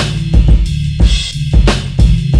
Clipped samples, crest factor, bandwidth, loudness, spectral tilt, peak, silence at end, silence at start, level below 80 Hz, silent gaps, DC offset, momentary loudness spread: under 0.1%; 10 dB; 10.5 kHz; -13 LUFS; -6 dB/octave; 0 dBFS; 0 s; 0 s; -12 dBFS; none; 0.4%; 3 LU